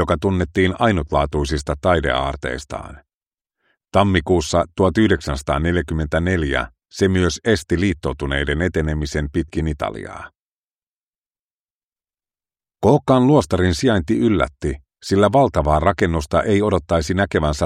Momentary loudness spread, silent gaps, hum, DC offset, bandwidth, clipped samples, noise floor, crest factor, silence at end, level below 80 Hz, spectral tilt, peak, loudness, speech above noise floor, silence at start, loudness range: 10 LU; 3.14-3.20 s, 3.27-3.31 s, 10.39-11.92 s; none; under 0.1%; 13.5 kHz; under 0.1%; under -90 dBFS; 18 dB; 0 s; -32 dBFS; -6 dB/octave; 0 dBFS; -19 LUFS; over 72 dB; 0 s; 8 LU